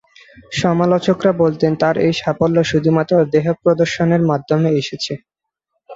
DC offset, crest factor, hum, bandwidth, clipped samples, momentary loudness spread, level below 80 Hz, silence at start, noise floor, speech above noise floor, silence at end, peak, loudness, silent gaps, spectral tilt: under 0.1%; 14 dB; none; 7.8 kHz; under 0.1%; 5 LU; -52 dBFS; 0.5 s; -74 dBFS; 59 dB; 0 s; -2 dBFS; -16 LUFS; none; -6.5 dB/octave